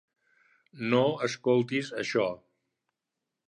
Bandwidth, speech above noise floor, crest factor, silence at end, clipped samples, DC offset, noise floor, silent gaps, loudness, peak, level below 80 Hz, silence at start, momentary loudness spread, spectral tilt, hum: 10.5 kHz; 59 dB; 20 dB; 1.15 s; under 0.1%; under 0.1%; -87 dBFS; none; -28 LUFS; -12 dBFS; -74 dBFS; 0.75 s; 8 LU; -5.5 dB/octave; none